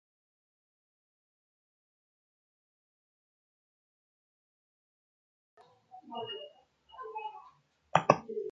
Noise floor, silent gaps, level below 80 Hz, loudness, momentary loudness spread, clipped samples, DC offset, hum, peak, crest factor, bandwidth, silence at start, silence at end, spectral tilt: -63 dBFS; none; -78 dBFS; -33 LUFS; 21 LU; under 0.1%; under 0.1%; none; -4 dBFS; 36 dB; 7.4 kHz; 5.95 s; 0 s; -3.5 dB/octave